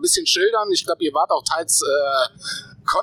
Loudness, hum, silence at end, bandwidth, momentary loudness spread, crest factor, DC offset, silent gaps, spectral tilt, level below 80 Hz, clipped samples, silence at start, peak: -19 LUFS; none; 0 s; 20 kHz; 9 LU; 16 dB; under 0.1%; none; -0.5 dB/octave; -58 dBFS; under 0.1%; 0 s; -4 dBFS